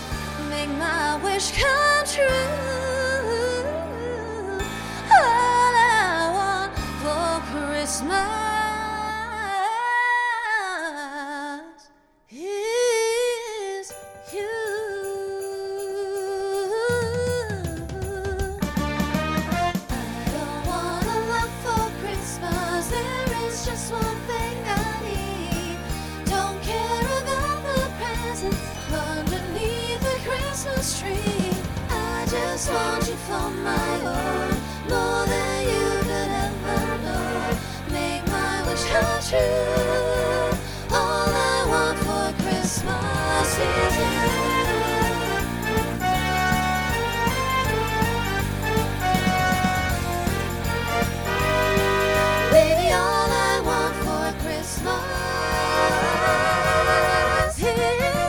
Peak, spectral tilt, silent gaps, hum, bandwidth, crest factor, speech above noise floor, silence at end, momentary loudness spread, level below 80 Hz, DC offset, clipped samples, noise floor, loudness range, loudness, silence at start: -4 dBFS; -4 dB/octave; none; none; over 20 kHz; 20 dB; 33 dB; 0 s; 9 LU; -36 dBFS; under 0.1%; under 0.1%; -56 dBFS; 6 LU; -23 LUFS; 0 s